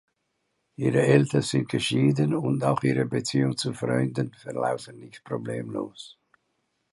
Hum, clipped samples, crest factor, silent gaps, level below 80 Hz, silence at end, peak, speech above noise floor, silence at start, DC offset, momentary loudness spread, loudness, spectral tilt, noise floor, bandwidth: none; under 0.1%; 20 dB; none; -64 dBFS; 0.85 s; -6 dBFS; 51 dB; 0.8 s; under 0.1%; 14 LU; -25 LUFS; -6 dB/octave; -76 dBFS; 11.5 kHz